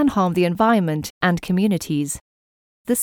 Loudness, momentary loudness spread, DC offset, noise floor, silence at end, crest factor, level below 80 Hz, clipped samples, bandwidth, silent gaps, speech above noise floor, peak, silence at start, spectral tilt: -20 LUFS; 9 LU; under 0.1%; under -90 dBFS; 0 s; 16 dB; -50 dBFS; under 0.1%; 18.5 kHz; 1.10-1.21 s, 2.21-2.85 s; over 71 dB; -4 dBFS; 0 s; -5.5 dB/octave